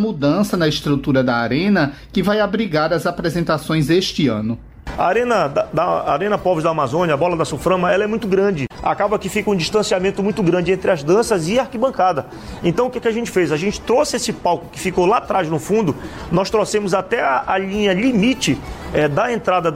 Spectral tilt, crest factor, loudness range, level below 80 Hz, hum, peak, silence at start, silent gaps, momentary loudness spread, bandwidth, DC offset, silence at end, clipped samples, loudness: -5.5 dB/octave; 12 dB; 1 LU; -42 dBFS; none; -6 dBFS; 0 s; none; 5 LU; 16 kHz; under 0.1%; 0 s; under 0.1%; -18 LUFS